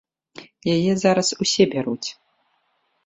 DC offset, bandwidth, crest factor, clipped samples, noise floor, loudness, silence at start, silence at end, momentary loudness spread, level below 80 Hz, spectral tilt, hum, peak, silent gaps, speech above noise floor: under 0.1%; 8.4 kHz; 20 dB; under 0.1%; -69 dBFS; -20 LUFS; 0.4 s; 0.95 s; 11 LU; -60 dBFS; -4.5 dB/octave; none; -4 dBFS; none; 49 dB